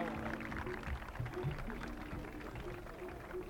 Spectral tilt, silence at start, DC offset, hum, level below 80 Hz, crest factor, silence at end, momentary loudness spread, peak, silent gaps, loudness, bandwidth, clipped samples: -6.5 dB/octave; 0 s; under 0.1%; none; -50 dBFS; 18 dB; 0 s; 6 LU; -26 dBFS; none; -44 LUFS; 19 kHz; under 0.1%